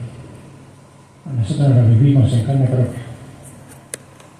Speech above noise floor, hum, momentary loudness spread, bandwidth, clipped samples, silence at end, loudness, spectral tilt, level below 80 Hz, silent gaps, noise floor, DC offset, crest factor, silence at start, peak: 31 dB; none; 24 LU; 12 kHz; under 0.1%; 0.45 s; -15 LUFS; -8 dB/octave; -48 dBFS; none; -44 dBFS; under 0.1%; 14 dB; 0 s; -4 dBFS